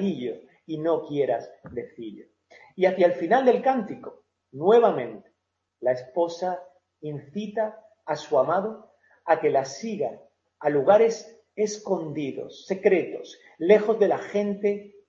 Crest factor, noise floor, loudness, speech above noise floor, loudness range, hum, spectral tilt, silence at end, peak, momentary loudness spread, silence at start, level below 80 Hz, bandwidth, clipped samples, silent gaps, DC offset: 20 dB; -75 dBFS; -24 LUFS; 50 dB; 5 LU; none; -6 dB/octave; 0.2 s; -6 dBFS; 19 LU; 0 s; -72 dBFS; 7.6 kHz; under 0.1%; none; under 0.1%